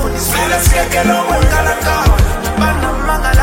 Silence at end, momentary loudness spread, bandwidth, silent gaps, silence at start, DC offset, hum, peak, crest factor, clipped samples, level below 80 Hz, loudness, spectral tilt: 0 s; 4 LU; 16.5 kHz; none; 0 s; under 0.1%; none; 0 dBFS; 12 dB; under 0.1%; -16 dBFS; -13 LUFS; -4.5 dB/octave